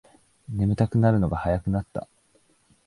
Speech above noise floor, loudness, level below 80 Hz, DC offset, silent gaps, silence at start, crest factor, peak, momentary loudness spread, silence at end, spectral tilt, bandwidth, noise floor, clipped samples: 40 dB; -24 LUFS; -42 dBFS; under 0.1%; none; 0.5 s; 18 dB; -6 dBFS; 14 LU; 0.85 s; -9.5 dB/octave; 11 kHz; -63 dBFS; under 0.1%